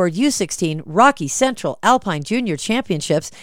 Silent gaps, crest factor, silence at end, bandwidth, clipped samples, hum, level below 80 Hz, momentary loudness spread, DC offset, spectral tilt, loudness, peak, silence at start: none; 18 dB; 0 s; 16.5 kHz; under 0.1%; none; -52 dBFS; 7 LU; under 0.1%; -4 dB/octave; -18 LUFS; 0 dBFS; 0 s